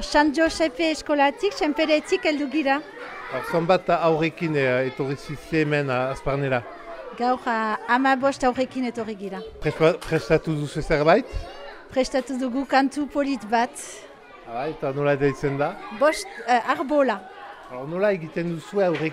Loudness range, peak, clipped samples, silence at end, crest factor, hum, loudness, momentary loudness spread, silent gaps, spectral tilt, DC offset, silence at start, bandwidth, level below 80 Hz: 3 LU; -6 dBFS; under 0.1%; 0 s; 18 dB; none; -23 LUFS; 12 LU; none; -5.5 dB/octave; under 0.1%; 0 s; 15 kHz; -46 dBFS